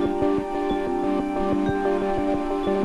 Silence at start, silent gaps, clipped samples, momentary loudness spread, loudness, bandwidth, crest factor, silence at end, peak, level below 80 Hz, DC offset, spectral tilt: 0 s; none; under 0.1%; 2 LU; -24 LUFS; 11.5 kHz; 12 dB; 0 s; -12 dBFS; -40 dBFS; under 0.1%; -7.5 dB/octave